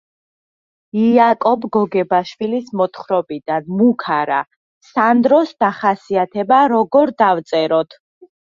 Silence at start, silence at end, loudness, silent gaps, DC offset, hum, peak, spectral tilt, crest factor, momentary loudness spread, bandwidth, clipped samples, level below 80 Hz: 0.95 s; 0.7 s; -16 LUFS; 4.56-4.81 s; under 0.1%; none; -2 dBFS; -7 dB/octave; 16 dB; 9 LU; 7.2 kHz; under 0.1%; -64 dBFS